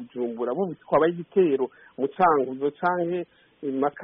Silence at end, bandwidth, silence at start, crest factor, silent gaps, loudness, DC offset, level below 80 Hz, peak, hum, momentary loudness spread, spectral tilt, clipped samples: 0 s; 3.9 kHz; 0 s; 18 dB; none; -25 LUFS; under 0.1%; -68 dBFS; -8 dBFS; none; 11 LU; -3 dB/octave; under 0.1%